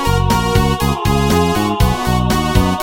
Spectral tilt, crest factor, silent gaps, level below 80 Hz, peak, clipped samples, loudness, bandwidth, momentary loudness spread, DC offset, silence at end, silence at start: -5.5 dB/octave; 14 dB; none; -22 dBFS; 0 dBFS; under 0.1%; -15 LUFS; 17 kHz; 2 LU; 1%; 0 s; 0 s